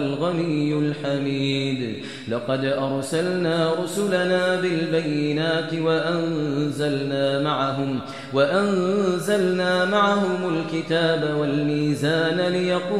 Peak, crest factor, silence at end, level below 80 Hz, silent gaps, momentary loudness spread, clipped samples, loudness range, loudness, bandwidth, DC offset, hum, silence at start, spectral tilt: -6 dBFS; 16 dB; 0 s; -62 dBFS; none; 5 LU; under 0.1%; 3 LU; -22 LUFS; 13.5 kHz; 0.3%; none; 0 s; -6 dB/octave